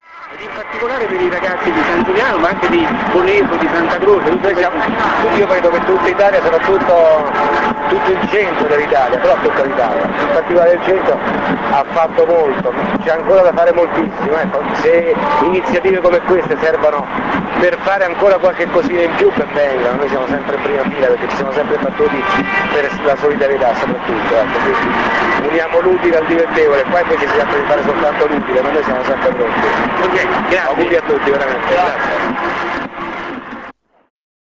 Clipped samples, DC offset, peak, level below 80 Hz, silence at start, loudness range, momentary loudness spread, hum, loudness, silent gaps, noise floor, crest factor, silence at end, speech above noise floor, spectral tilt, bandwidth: under 0.1%; 0.2%; 0 dBFS; -42 dBFS; 0.1 s; 3 LU; 5 LU; none; -13 LUFS; none; -36 dBFS; 12 dB; 0.85 s; 23 dB; -6 dB/octave; 7.6 kHz